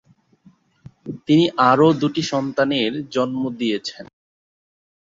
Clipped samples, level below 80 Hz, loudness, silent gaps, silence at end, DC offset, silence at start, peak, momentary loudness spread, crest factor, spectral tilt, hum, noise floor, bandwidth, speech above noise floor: under 0.1%; -62 dBFS; -19 LUFS; none; 1 s; under 0.1%; 1.05 s; -2 dBFS; 17 LU; 20 dB; -6 dB/octave; none; -54 dBFS; 7.6 kHz; 36 dB